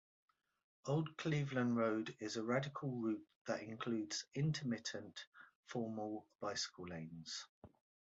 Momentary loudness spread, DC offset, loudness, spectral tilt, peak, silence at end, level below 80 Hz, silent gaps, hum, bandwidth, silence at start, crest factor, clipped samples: 12 LU; under 0.1%; -42 LUFS; -5 dB/octave; -24 dBFS; 0.5 s; -76 dBFS; 3.36-3.45 s, 5.27-5.32 s, 5.55-5.63 s, 7.49-7.62 s; none; 7.6 kHz; 0.85 s; 18 dB; under 0.1%